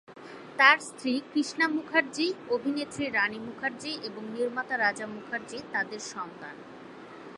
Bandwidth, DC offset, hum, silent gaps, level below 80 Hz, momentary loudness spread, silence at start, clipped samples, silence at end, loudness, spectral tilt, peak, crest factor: 11.5 kHz; under 0.1%; none; none; -72 dBFS; 21 LU; 0.1 s; under 0.1%; 0 s; -28 LUFS; -3 dB/octave; -6 dBFS; 24 dB